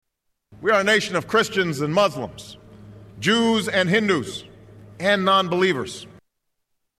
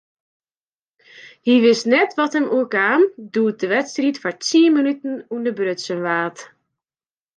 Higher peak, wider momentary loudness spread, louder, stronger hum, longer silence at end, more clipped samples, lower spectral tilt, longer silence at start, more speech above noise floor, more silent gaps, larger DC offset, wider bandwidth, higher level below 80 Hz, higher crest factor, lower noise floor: second, -8 dBFS vs -4 dBFS; first, 15 LU vs 10 LU; about the same, -20 LUFS vs -18 LUFS; neither; about the same, 0.9 s vs 0.9 s; neither; about the same, -4.5 dB/octave vs -4 dB/octave; second, 0.5 s vs 1.25 s; second, 54 dB vs over 72 dB; neither; neither; first, 14 kHz vs 9.8 kHz; first, -58 dBFS vs -74 dBFS; about the same, 16 dB vs 16 dB; second, -74 dBFS vs under -90 dBFS